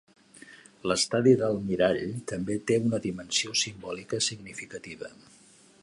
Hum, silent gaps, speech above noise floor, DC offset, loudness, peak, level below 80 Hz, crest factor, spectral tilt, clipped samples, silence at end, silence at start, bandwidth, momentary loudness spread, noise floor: none; none; 24 dB; under 0.1%; -27 LUFS; -8 dBFS; -60 dBFS; 20 dB; -4 dB/octave; under 0.1%; 0.75 s; 0.5 s; 11.5 kHz; 17 LU; -52 dBFS